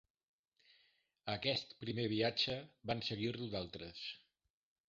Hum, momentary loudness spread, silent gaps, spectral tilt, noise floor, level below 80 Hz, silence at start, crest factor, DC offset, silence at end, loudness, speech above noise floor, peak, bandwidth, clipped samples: none; 12 LU; none; -3.5 dB/octave; -76 dBFS; -68 dBFS; 1.25 s; 22 dB; under 0.1%; 0.7 s; -40 LUFS; 35 dB; -20 dBFS; 7.4 kHz; under 0.1%